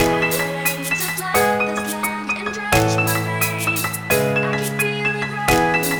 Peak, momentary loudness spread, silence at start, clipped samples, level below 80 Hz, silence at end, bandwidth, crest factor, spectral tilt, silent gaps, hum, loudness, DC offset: -2 dBFS; 5 LU; 0 s; under 0.1%; -42 dBFS; 0 s; over 20 kHz; 18 dB; -4 dB/octave; none; none; -19 LUFS; under 0.1%